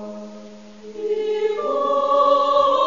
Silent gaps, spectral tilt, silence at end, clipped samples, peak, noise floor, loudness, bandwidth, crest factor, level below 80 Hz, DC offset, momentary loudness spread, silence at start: none; -4.5 dB/octave; 0 s; under 0.1%; -6 dBFS; -40 dBFS; -19 LUFS; 7.4 kHz; 14 dB; -64 dBFS; 0.4%; 22 LU; 0 s